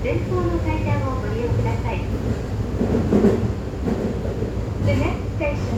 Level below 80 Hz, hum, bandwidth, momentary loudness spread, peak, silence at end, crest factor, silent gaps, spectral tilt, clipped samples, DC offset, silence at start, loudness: -30 dBFS; none; 12.5 kHz; 7 LU; -4 dBFS; 0 s; 16 dB; none; -8 dB/octave; under 0.1%; under 0.1%; 0 s; -23 LUFS